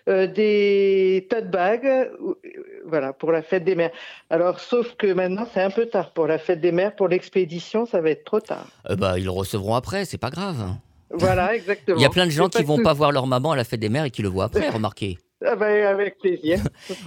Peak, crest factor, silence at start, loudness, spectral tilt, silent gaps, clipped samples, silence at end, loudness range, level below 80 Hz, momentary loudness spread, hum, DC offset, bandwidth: -2 dBFS; 20 dB; 0.05 s; -22 LUFS; -6 dB/octave; none; under 0.1%; 0 s; 4 LU; -50 dBFS; 10 LU; none; under 0.1%; 17 kHz